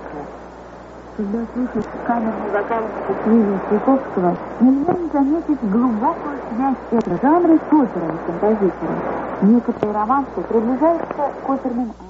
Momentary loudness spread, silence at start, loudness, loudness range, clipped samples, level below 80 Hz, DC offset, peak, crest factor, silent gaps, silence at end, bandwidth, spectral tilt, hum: 10 LU; 0 s; -19 LUFS; 3 LU; under 0.1%; -46 dBFS; under 0.1%; -4 dBFS; 14 dB; none; 0 s; 7.2 kHz; -8 dB/octave; none